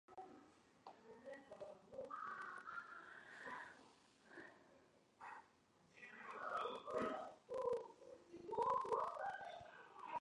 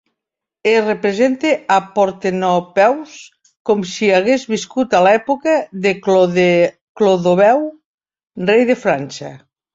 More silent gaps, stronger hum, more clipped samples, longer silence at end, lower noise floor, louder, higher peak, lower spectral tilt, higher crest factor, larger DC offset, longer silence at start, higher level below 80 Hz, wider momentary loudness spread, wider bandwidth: second, none vs 3.60-3.65 s, 6.81-6.95 s, 7.86-7.98 s; neither; neither; second, 0 s vs 0.4 s; second, -74 dBFS vs -83 dBFS; second, -48 LUFS vs -15 LUFS; second, -28 dBFS vs -2 dBFS; about the same, -4.5 dB/octave vs -5.5 dB/octave; first, 22 dB vs 14 dB; neither; second, 0.1 s vs 0.65 s; second, -84 dBFS vs -60 dBFS; first, 19 LU vs 9 LU; first, 11 kHz vs 7.8 kHz